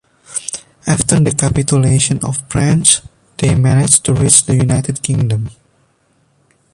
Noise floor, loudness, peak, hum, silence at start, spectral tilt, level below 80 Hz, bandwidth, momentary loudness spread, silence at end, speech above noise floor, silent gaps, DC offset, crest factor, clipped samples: -57 dBFS; -13 LUFS; 0 dBFS; none; 0.3 s; -4.5 dB/octave; -36 dBFS; 14 kHz; 14 LU; 1.2 s; 45 dB; none; under 0.1%; 14 dB; under 0.1%